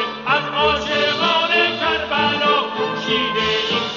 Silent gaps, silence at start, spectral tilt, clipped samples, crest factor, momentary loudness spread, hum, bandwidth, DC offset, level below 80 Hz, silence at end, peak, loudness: none; 0 s; -3.5 dB/octave; under 0.1%; 14 dB; 4 LU; none; 7.4 kHz; under 0.1%; -46 dBFS; 0 s; -4 dBFS; -17 LUFS